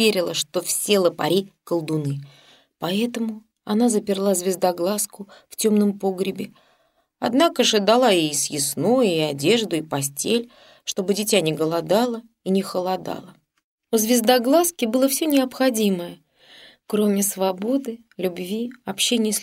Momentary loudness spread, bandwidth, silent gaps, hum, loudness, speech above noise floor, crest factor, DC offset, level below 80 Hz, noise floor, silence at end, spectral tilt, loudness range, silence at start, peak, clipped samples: 12 LU; 16 kHz; 13.64-13.78 s; none; -21 LUFS; 43 dB; 20 dB; under 0.1%; -68 dBFS; -65 dBFS; 0 s; -4 dB/octave; 4 LU; 0 s; -2 dBFS; under 0.1%